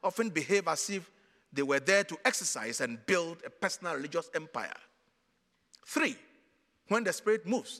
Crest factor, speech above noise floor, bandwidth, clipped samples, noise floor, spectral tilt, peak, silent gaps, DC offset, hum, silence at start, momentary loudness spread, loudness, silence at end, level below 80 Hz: 24 dB; 43 dB; 15.5 kHz; under 0.1%; -75 dBFS; -3 dB/octave; -10 dBFS; none; under 0.1%; none; 0.05 s; 12 LU; -32 LUFS; 0 s; -84 dBFS